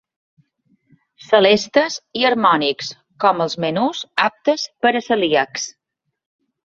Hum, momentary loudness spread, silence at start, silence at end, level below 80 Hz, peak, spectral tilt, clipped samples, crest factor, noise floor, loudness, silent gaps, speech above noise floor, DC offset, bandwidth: none; 9 LU; 1.3 s; 0.95 s; -64 dBFS; 0 dBFS; -3.5 dB/octave; under 0.1%; 20 dB; -77 dBFS; -18 LUFS; none; 60 dB; under 0.1%; 8 kHz